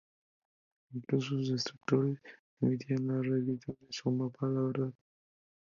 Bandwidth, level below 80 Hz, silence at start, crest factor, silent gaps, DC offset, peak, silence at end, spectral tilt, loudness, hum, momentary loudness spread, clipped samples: 7.4 kHz; -74 dBFS; 0.9 s; 20 dB; 2.39-2.57 s; under 0.1%; -14 dBFS; 0.75 s; -7 dB/octave; -34 LUFS; none; 9 LU; under 0.1%